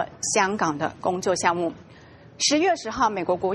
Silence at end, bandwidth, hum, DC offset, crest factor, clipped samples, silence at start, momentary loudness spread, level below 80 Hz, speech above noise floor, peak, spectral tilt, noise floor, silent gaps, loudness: 0 s; 11.5 kHz; none; under 0.1%; 20 dB; under 0.1%; 0 s; 6 LU; -58 dBFS; 24 dB; -6 dBFS; -3 dB/octave; -48 dBFS; none; -23 LUFS